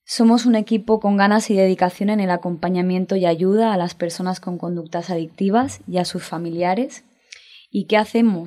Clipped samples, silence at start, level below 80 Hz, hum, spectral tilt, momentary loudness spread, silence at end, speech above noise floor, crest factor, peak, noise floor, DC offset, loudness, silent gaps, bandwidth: under 0.1%; 0.1 s; -62 dBFS; none; -6 dB/octave; 11 LU; 0 s; 27 dB; 16 dB; -2 dBFS; -45 dBFS; under 0.1%; -19 LUFS; none; 13.5 kHz